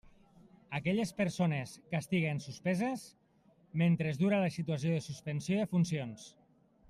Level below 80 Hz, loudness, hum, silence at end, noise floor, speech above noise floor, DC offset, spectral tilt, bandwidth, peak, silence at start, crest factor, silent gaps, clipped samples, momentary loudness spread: -70 dBFS; -34 LUFS; none; 0.6 s; -67 dBFS; 34 dB; under 0.1%; -6.5 dB/octave; 13 kHz; -18 dBFS; 0.7 s; 16 dB; none; under 0.1%; 11 LU